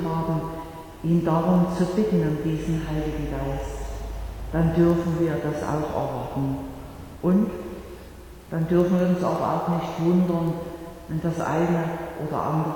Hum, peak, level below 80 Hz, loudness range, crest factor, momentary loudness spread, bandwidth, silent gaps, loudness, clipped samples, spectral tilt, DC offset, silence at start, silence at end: none; -8 dBFS; -40 dBFS; 2 LU; 16 dB; 15 LU; 18.5 kHz; none; -25 LUFS; under 0.1%; -8 dB/octave; under 0.1%; 0 s; 0 s